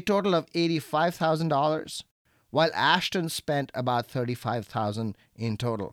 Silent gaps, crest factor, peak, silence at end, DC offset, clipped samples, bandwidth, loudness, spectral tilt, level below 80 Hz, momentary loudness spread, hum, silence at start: 2.11-2.25 s; 20 dB; -6 dBFS; 0 s; under 0.1%; under 0.1%; 17.5 kHz; -27 LUFS; -5 dB/octave; -64 dBFS; 10 LU; none; 0 s